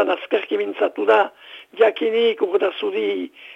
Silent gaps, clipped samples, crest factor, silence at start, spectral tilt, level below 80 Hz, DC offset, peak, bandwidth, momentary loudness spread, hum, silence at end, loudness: none; under 0.1%; 16 dB; 0 s; -5 dB/octave; -76 dBFS; under 0.1%; -4 dBFS; 5.6 kHz; 8 LU; none; 0 s; -20 LUFS